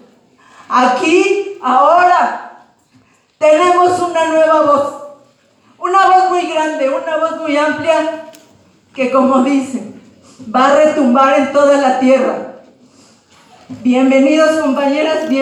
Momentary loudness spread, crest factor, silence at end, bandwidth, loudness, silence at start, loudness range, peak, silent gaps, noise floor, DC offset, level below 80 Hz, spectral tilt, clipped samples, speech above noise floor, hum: 11 LU; 12 dB; 0 s; 11.5 kHz; -12 LUFS; 0.7 s; 3 LU; 0 dBFS; none; -51 dBFS; under 0.1%; -64 dBFS; -4 dB/octave; under 0.1%; 40 dB; none